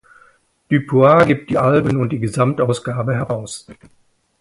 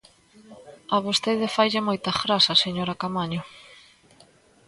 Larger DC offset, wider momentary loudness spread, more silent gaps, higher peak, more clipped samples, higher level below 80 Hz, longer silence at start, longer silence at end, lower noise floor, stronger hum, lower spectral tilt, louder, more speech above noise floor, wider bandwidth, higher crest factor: neither; about the same, 12 LU vs 13 LU; neither; first, 0 dBFS vs -4 dBFS; neither; first, -50 dBFS vs -62 dBFS; first, 0.7 s vs 0.5 s; second, 0.7 s vs 0.95 s; about the same, -54 dBFS vs -56 dBFS; neither; first, -7 dB/octave vs -4 dB/octave; first, -16 LUFS vs -23 LUFS; first, 38 dB vs 32 dB; about the same, 11.5 kHz vs 11.5 kHz; about the same, 18 dB vs 22 dB